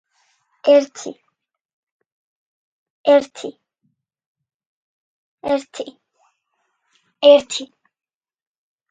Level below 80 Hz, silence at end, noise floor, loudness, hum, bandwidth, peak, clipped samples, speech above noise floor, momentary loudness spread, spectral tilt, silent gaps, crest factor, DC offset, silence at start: -68 dBFS; 1.25 s; -73 dBFS; -16 LUFS; none; 9.4 kHz; 0 dBFS; under 0.1%; 57 dB; 22 LU; -2.5 dB/octave; 1.61-2.00 s, 2.06-3.04 s, 4.26-4.35 s, 4.54-4.60 s, 4.66-5.38 s; 22 dB; under 0.1%; 0.65 s